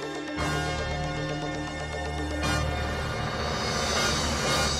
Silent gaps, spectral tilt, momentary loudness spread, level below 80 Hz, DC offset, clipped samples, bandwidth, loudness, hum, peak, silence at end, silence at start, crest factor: none; -3.5 dB/octave; 8 LU; -38 dBFS; under 0.1%; under 0.1%; 15.5 kHz; -28 LUFS; none; -14 dBFS; 0 s; 0 s; 14 dB